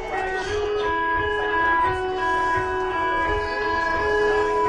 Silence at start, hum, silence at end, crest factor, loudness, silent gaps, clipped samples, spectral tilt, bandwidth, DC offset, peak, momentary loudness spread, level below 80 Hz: 0 s; none; 0 s; 12 dB; -22 LUFS; none; under 0.1%; -4.5 dB/octave; 10 kHz; under 0.1%; -10 dBFS; 5 LU; -40 dBFS